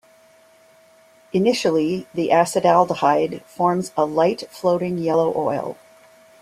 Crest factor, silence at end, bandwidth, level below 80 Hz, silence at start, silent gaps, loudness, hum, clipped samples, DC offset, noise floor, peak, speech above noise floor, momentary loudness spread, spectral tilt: 18 dB; 0.7 s; 15 kHz; -64 dBFS; 1.35 s; none; -20 LUFS; none; under 0.1%; under 0.1%; -53 dBFS; -2 dBFS; 33 dB; 8 LU; -5.5 dB/octave